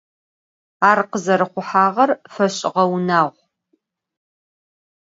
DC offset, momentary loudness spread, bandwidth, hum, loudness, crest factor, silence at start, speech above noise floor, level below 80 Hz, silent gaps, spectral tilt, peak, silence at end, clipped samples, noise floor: under 0.1%; 5 LU; 7.8 kHz; none; -18 LUFS; 20 dB; 0.8 s; 51 dB; -70 dBFS; none; -5 dB/octave; 0 dBFS; 1.75 s; under 0.1%; -68 dBFS